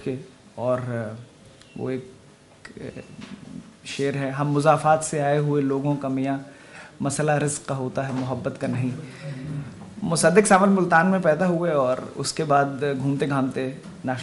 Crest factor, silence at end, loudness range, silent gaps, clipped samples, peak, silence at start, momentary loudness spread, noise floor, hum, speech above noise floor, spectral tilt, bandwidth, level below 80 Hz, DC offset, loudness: 20 dB; 0 s; 12 LU; none; under 0.1%; -4 dBFS; 0 s; 21 LU; -48 dBFS; none; 25 dB; -5.5 dB/octave; 11.5 kHz; -60 dBFS; under 0.1%; -23 LUFS